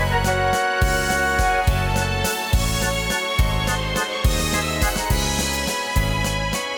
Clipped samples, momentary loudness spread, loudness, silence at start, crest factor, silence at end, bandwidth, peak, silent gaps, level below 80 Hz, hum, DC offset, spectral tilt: under 0.1%; 3 LU; -21 LUFS; 0 s; 12 dB; 0 s; 19 kHz; -8 dBFS; none; -26 dBFS; none; under 0.1%; -3.5 dB/octave